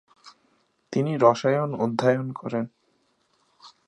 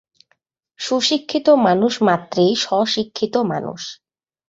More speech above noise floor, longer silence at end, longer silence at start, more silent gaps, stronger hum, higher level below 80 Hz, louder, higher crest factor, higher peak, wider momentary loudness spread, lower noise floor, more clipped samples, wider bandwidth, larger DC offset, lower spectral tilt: second, 45 dB vs 49 dB; second, 0.2 s vs 0.55 s; second, 0.25 s vs 0.8 s; neither; neither; second, -72 dBFS vs -62 dBFS; second, -24 LUFS vs -18 LUFS; about the same, 22 dB vs 18 dB; about the same, -4 dBFS vs -2 dBFS; second, 11 LU vs 14 LU; about the same, -68 dBFS vs -66 dBFS; neither; first, 10.5 kHz vs 8 kHz; neither; first, -7 dB/octave vs -4.5 dB/octave